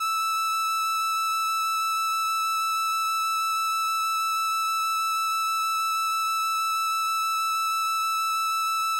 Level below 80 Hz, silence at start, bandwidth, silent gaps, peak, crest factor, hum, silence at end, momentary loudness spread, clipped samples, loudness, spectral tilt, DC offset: -78 dBFS; 0 s; 16.5 kHz; none; -22 dBFS; 4 dB; 50 Hz at -75 dBFS; 0 s; 0 LU; under 0.1%; -24 LUFS; 5.5 dB/octave; under 0.1%